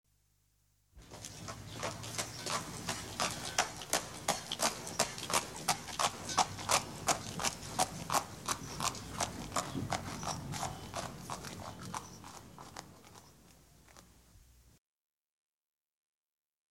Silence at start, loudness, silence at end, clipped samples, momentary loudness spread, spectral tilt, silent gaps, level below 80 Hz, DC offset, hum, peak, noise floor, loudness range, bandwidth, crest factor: 0.95 s; -36 LUFS; 1.95 s; under 0.1%; 16 LU; -2 dB/octave; none; -60 dBFS; under 0.1%; none; -12 dBFS; -74 dBFS; 15 LU; 17 kHz; 28 dB